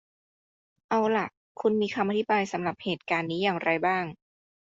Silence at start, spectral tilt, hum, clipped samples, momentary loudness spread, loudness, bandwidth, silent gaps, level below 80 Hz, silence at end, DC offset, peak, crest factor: 0.9 s; -6 dB/octave; none; under 0.1%; 5 LU; -27 LUFS; 7.8 kHz; 1.37-1.55 s; -70 dBFS; 0.6 s; under 0.1%; -10 dBFS; 18 dB